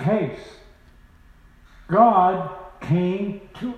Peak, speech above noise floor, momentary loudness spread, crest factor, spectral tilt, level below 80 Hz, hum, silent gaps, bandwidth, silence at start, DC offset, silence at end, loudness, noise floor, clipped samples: -2 dBFS; 30 dB; 18 LU; 20 dB; -9 dB/octave; -52 dBFS; none; none; 8.8 kHz; 0 s; under 0.1%; 0 s; -21 LUFS; -51 dBFS; under 0.1%